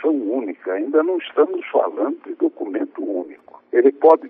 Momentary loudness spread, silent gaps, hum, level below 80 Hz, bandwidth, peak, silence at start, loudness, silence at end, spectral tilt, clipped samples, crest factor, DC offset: 9 LU; none; none; -82 dBFS; 3.7 kHz; -2 dBFS; 0 s; -20 LUFS; 0 s; -7 dB/octave; under 0.1%; 18 dB; under 0.1%